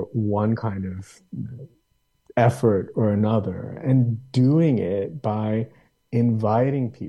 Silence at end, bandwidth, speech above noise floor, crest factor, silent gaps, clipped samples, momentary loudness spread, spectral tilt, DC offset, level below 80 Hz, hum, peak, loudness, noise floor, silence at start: 0 s; 11.5 kHz; 46 dB; 18 dB; none; under 0.1%; 16 LU; -9 dB/octave; under 0.1%; -58 dBFS; none; -6 dBFS; -22 LUFS; -68 dBFS; 0 s